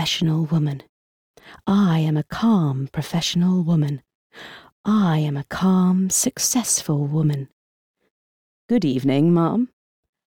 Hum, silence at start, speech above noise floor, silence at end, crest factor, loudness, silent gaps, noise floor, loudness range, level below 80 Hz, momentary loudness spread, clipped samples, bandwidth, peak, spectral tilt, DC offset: none; 0 s; over 70 dB; 0.6 s; 12 dB; -20 LUFS; 0.89-1.34 s, 4.15-4.30 s, 4.72-4.84 s, 7.52-7.94 s, 8.10-8.69 s; under -90 dBFS; 2 LU; -56 dBFS; 12 LU; under 0.1%; 17 kHz; -8 dBFS; -5 dB/octave; under 0.1%